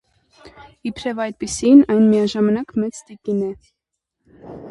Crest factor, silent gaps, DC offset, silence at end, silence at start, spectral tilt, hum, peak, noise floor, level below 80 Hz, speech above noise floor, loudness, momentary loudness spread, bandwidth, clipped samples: 18 dB; none; under 0.1%; 0 s; 0.45 s; -6 dB/octave; none; 0 dBFS; -78 dBFS; -52 dBFS; 60 dB; -17 LUFS; 19 LU; 11.5 kHz; under 0.1%